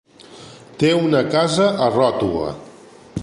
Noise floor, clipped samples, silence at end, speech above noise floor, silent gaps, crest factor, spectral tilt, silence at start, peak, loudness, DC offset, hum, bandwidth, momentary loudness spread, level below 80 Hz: -43 dBFS; under 0.1%; 0 s; 26 dB; none; 16 dB; -5.5 dB/octave; 0.3 s; -2 dBFS; -18 LUFS; under 0.1%; none; 11.5 kHz; 16 LU; -48 dBFS